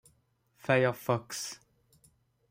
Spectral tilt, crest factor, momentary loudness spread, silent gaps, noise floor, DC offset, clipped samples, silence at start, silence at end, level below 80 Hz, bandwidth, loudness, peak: -5 dB/octave; 24 dB; 16 LU; none; -71 dBFS; under 0.1%; under 0.1%; 0.65 s; 0.95 s; -74 dBFS; 16 kHz; -31 LUFS; -10 dBFS